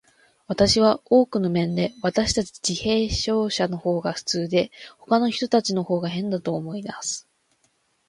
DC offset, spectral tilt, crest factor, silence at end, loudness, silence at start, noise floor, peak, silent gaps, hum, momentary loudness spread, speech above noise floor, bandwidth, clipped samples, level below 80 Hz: under 0.1%; -4.5 dB/octave; 18 dB; 0.9 s; -23 LUFS; 0.5 s; -67 dBFS; -4 dBFS; none; none; 10 LU; 45 dB; 11.5 kHz; under 0.1%; -46 dBFS